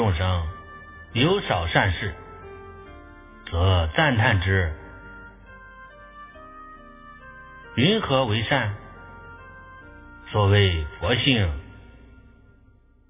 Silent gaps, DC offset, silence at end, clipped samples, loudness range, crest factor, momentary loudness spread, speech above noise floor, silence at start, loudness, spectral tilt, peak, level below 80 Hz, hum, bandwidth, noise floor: none; under 0.1%; 1.3 s; under 0.1%; 4 LU; 22 dB; 25 LU; 34 dB; 0 s; -22 LUFS; -10 dB/octave; -2 dBFS; -36 dBFS; none; 3.8 kHz; -55 dBFS